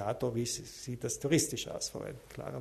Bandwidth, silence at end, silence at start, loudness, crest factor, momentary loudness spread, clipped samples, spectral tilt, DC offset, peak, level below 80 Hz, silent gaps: 13.5 kHz; 0 s; 0 s; -35 LUFS; 20 dB; 14 LU; under 0.1%; -4 dB/octave; under 0.1%; -16 dBFS; -60 dBFS; none